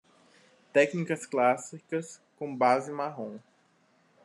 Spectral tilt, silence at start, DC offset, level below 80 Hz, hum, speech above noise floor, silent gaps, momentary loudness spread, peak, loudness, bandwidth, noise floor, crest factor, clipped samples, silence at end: -5 dB/octave; 0.75 s; under 0.1%; -86 dBFS; none; 38 dB; none; 15 LU; -10 dBFS; -29 LUFS; 12 kHz; -67 dBFS; 20 dB; under 0.1%; 0.85 s